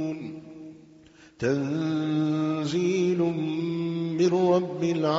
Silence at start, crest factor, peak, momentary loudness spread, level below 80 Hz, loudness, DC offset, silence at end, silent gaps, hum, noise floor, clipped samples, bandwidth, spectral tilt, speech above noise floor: 0 s; 16 dB; -10 dBFS; 16 LU; -66 dBFS; -26 LUFS; under 0.1%; 0 s; none; none; -53 dBFS; under 0.1%; 7.8 kHz; -6.5 dB/octave; 28 dB